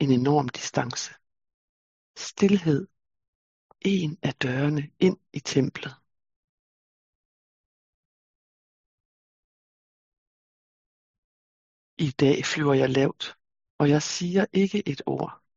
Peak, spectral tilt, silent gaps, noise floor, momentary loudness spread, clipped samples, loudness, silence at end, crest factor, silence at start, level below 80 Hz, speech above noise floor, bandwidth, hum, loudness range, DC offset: -8 dBFS; -5.5 dB/octave; 1.54-2.14 s, 3.28-3.69 s, 6.36-10.12 s, 10.18-11.97 s, 13.70-13.79 s; under -90 dBFS; 12 LU; under 0.1%; -25 LUFS; 0.2 s; 20 dB; 0 s; -66 dBFS; over 66 dB; 7.8 kHz; none; 8 LU; under 0.1%